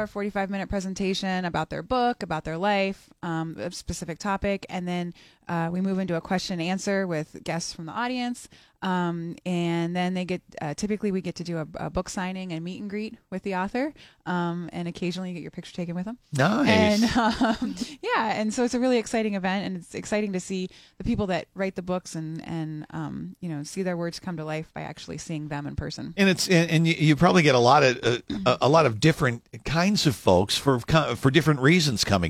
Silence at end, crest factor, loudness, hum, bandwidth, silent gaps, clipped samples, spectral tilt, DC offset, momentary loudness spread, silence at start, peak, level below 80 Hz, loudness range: 0 s; 22 dB; -26 LUFS; none; 15.5 kHz; none; under 0.1%; -5.5 dB/octave; under 0.1%; 14 LU; 0 s; -4 dBFS; -50 dBFS; 10 LU